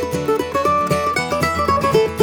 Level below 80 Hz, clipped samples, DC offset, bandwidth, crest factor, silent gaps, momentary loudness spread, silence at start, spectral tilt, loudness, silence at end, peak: -40 dBFS; under 0.1%; under 0.1%; 19.5 kHz; 16 dB; none; 4 LU; 0 s; -5 dB/octave; -18 LUFS; 0 s; -2 dBFS